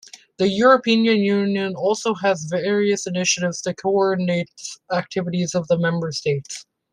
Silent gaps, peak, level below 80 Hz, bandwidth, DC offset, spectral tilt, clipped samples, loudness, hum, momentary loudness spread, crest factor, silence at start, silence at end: none; -2 dBFS; -62 dBFS; 10.5 kHz; under 0.1%; -4.5 dB/octave; under 0.1%; -20 LUFS; none; 9 LU; 18 dB; 0.4 s; 0.3 s